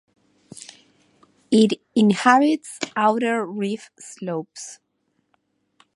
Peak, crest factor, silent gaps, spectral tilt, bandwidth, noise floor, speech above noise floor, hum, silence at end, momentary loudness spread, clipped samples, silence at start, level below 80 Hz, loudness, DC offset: 0 dBFS; 22 dB; none; -5 dB/octave; 11.5 kHz; -71 dBFS; 50 dB; none; 1.2 s; 24 LU; under 0.1%; 1.5 s; -72 dBFS; -20 LUFS; under 0.1%